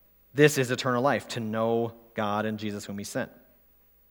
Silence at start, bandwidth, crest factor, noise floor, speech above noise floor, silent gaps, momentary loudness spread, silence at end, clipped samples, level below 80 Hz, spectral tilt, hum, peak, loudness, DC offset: 0.35 s; 20 kHz; 22 dB; -61 dBFS; 34 dB; none; 13 LU; 0.85 s; under 0.1%; -68 dBFS; -5 dB/octave; none; -6 dBFS; -28 LUFS; under 0.1%